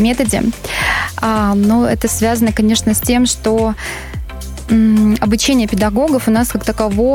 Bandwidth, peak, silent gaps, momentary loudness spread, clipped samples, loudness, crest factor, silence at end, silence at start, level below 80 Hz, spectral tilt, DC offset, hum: 17 kHz; -2 dBFS; none; 8 LU; under 0.1%; -14 LUFS; 12 dB; 0 s; 0 s; -28 dBFS; -4.5 dB/octave; under 0.1%; none